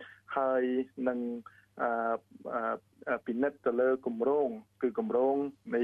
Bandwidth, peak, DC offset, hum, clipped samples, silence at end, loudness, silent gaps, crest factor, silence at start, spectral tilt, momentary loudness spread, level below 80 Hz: 4.1 kHz; -18 dBFS; under 0.1%; none; under 0.1%; 0 s; -32 LUFS; none; 14 dB; 0 s; -8 dB/octave; 8 LU; -78 dBFS